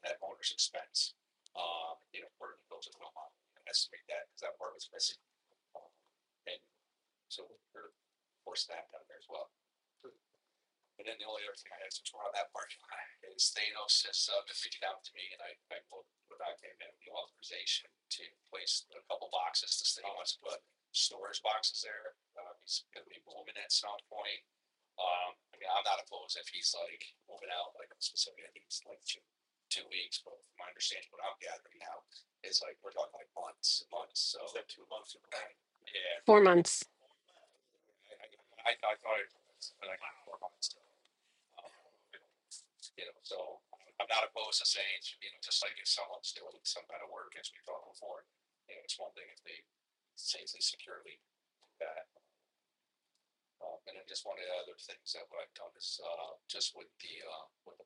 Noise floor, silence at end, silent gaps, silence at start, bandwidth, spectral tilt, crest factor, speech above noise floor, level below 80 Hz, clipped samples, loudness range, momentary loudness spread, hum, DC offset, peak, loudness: -88 dBFS; 0.05 s; none; 0.05 s; 11 kHz; -1.5 dB/octave; 30 dB; 50 dB; under -90 dBFS; under 0.1%; 16 LU; 20 LU; none; under 0.1%; -10 dBFS; -37 LUFS